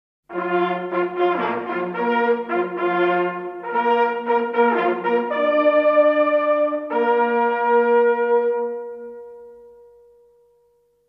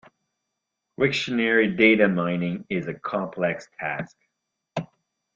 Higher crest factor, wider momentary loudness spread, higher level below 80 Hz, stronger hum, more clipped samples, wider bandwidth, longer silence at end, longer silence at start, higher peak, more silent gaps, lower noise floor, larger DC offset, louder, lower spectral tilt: second, 14 dB vs 20 dB; second, 11 LU vs 17 LU; second, -72 dBFS vs -62 dBFS; neither; neither; second, 5.4 kHz vs 7.8 kHz; first, 1.4 s vs 0.5 s; second, 0.3 s vs 1 s; about the same, -6 dBFS vs -4 dBFS; neither; second, -61 dBFS vs -82 dBFS; neither; first, -20 LUFS vs -23 LUFS; first, -8 dB/octave vs -6 dB/octave